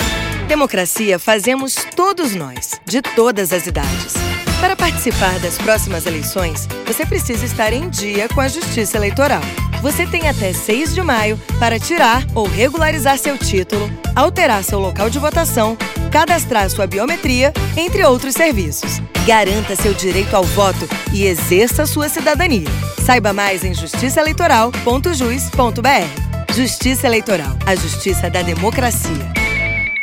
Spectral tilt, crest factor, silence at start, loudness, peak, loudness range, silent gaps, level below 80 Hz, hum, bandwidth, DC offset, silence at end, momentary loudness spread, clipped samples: -4 dB/octave; 14 dB; 0 s; -15 LUFS; 0 dBFS; 2 LU; none; -28 dBFS; none; 17 kHz; under 0.1%; 0 s; 6 LU; under 0.1%